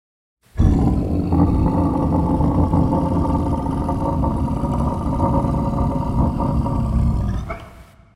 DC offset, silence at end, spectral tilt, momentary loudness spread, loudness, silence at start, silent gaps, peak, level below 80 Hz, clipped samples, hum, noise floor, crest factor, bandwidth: under 0.1%; 0.35 s; -10 dB/octave; 5 LU; -20 LUFS; 0.55 s; none; -2 dBFS; -24 dBFS; under 0.1%; none; -43 dBFS; 16 dB; 11 kHz